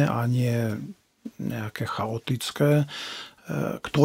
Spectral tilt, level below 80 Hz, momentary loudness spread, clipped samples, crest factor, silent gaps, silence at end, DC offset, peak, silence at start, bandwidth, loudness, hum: -6.5 dB/octave; -60 dBFS; 14 LU; under 0.1%; 22 dB; none; 0 s; under 0.1%; -4 dBFS; 0 s; 16 kHz; -27 LUFS; none